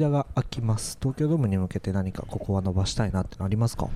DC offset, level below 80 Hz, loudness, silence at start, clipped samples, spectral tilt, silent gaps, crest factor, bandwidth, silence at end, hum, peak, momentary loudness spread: under 0.1%; -40 dBFS; -27 LUFS; 0 s; under 0.1%; -6.5 dB/octave; none; 14 dB; 14 kHz; 0 s; none; -10 dBFS; 5 LU